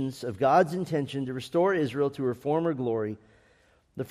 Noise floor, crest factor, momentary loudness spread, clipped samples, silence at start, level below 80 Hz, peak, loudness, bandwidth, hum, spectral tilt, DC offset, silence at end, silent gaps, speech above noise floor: -63 dBFS; 18 dB; 12 LU; under 0.1%; 0 s; -66 dBFS; -10 dBFS; -27 LUFS; 15 kHz; none; -7 dB/octave; under 0.1%; 0 s; none; 36 dB